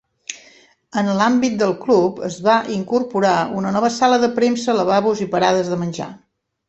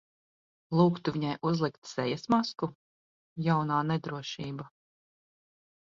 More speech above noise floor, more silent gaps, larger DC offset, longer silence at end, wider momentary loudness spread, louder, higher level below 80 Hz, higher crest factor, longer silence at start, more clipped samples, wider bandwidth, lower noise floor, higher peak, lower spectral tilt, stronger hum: second, 33 dB vs over 61 dB; second, none vs 1.78-1.82 s, 2.75-3.36 s; neither; second, 0.5 s vs 1.2 s; about the same, 11 LU vs 12 LU; first, -18 LUFS vs -30 LUFS; first, -60 dBFS vs -68 dBFS; about the same, 16 dB vs 20 dB; second, 0.3 s vs 0.7 s; neither; first, 8.4 kHz vs 7.4 kHz; second, -50 dBFS vs under -90 dBFS; first, -2 dBFS vs -12 dBFS; second, -5 dB/octave vs -7 dB/octave; neither